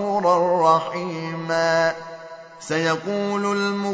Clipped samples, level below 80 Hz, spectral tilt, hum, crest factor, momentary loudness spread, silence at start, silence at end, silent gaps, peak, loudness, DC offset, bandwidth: under 0.1%; -70 dBFS; -5 dB/octave; none; 16 dB; 18 LU; 0 s; 0 s; none; -6 dBFS; -21 LUFS; under 0.1%; 8 kHz